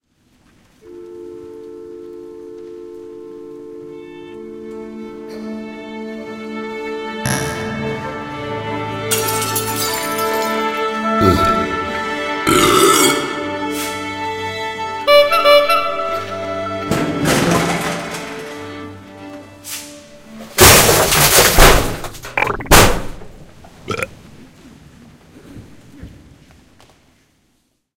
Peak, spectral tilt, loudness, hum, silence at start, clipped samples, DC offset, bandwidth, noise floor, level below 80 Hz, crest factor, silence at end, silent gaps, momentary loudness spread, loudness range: 0 dBFS; -3 dB/octave; -15 LUFS; none; 0.85 s; 0.1%; under 0.1%; 17 kHz; -63 dBFS; -30 dBFS; 18 dB; 1.85 s; none; 24 LU; 21 LU